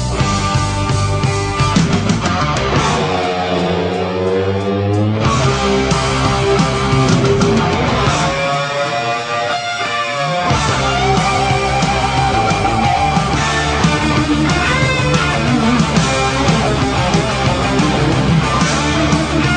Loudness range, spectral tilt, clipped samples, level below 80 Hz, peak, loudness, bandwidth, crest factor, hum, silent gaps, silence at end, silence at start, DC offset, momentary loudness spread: 2 LU; -5 dB/octave; under 0.1%; -28 dBFS; 0 dBFS; -14 LUFS; 10 kHz; 14 dB; none; none; 0 s; 0 s; under 0.1%; 3 LU